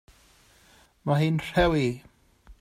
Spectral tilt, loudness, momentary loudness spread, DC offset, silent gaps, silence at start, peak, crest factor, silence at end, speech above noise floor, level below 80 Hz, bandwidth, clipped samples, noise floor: -7 dB/octave; -25 LUFS; 12 LU; under 0.1%; none; 1.05 s; -10 dBFS; 18 dB; 0.1 s; 34 dB; -44 dBFS; 14.5 kHz; under 0.1%; -58 dBFS